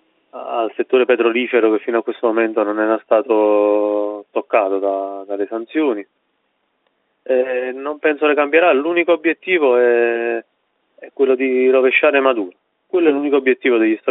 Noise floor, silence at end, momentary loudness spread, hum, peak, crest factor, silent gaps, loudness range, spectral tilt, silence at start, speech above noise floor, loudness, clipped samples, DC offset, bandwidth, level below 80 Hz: -67 dBFS; 0 s; 10 LU; none; 0 dBFS; 16 dB; none; 6 LU; -1.5 dB/octave; 0.35 s; 51 dB; -16 LUFS; under 0.1%; under 0.1%; 4 kHz; -70 dBFS